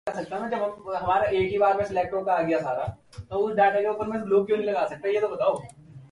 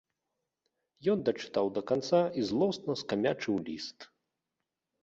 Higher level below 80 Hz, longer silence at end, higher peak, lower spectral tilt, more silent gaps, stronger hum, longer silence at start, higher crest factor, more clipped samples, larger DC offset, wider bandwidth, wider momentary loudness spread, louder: first, -54 dBFS vs -70 dBFS; second, 0.05 s vs 1 s; first, -10 dBFS vs -14 dBFS; about the same, -6.5 dB/octave vs -6 dB/octave; neither; neither; second, 0.05 s vs 1 s; about the same, 16 dB vs 18 dB; neither; neither; first, 11.5 kHz vs 8 kHz; first, 10 LU vs 7 LU; first, -25 LUFS vs -31 LUFS